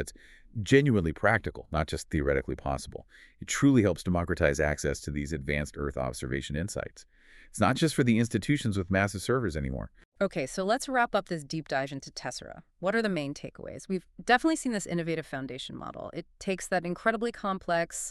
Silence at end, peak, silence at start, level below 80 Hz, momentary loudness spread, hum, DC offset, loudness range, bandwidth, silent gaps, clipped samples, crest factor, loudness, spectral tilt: 0 s; -8 dBFS; 0 s; -46 dBFS; 14 LU; none; under 0.1%; 4 LU; 13.5 kHz; 10.05-10.12 s; under 0.1%; 22 dB; -29 LUFS; -5.5 dB/octave